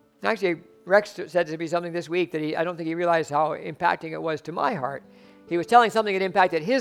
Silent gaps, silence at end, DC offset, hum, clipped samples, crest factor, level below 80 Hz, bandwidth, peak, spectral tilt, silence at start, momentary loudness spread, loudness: none; 0 s; under 0.1%; none; under 0.1%; 22 dB; -70 dBFS; 14.5 kHz; -2 dBFS; -5.5 dB/octave; 0.2 s; 10 LU; -24 LUFS